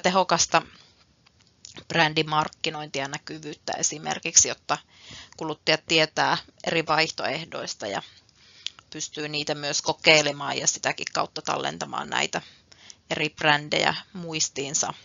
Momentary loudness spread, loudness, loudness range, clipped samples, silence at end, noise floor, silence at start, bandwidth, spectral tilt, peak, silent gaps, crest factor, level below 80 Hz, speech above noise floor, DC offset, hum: 15 LU; -24 LUFS; 4 LU; under 0.1%; 0.05 s; -60 dBFS; 0.05 s; 7.6 kHz; -1.5 dB/octave; 0 dBFS; none; 26 dB; -66 dBFS; 34 dB; under 0.1%; none